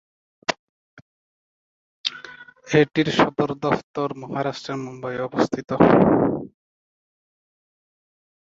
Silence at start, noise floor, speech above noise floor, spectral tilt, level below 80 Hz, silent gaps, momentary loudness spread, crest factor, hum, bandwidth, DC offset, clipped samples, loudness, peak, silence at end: 0.5 s; -43 dBFS; 23 dB; -6 dB/octave; -54 dBFS; 0.59-2.04 s, 3.83-3.94 s; 15 LU; 22 dB; none; 7.8 kHz; under 0.1%; under 0.1%; -22 LUFS; -2 dBFS; 1.95 s